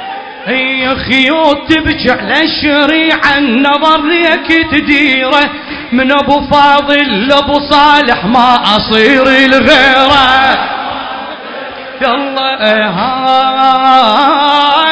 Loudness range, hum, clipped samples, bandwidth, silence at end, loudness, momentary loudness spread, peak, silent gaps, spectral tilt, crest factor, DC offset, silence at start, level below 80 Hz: 4 LU; none; 2%; 8 kHz; 0 s; -8 LUFS; 9 LU; 0 dBFS; none; -4.5 dB/octave; 8 dB; under 0.1%; 0 s; -36 dBFS